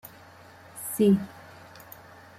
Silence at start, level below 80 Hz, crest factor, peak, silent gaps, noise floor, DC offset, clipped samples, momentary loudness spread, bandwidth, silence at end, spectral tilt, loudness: 0.75 s; -68 dBFS; 18 dB; -12 dBFS; none; -50 dBFS; under 0.1%; under 0.1%; 25 LU; 16 kHz; 1 s; -6.5 dB/octave; -25 LUFS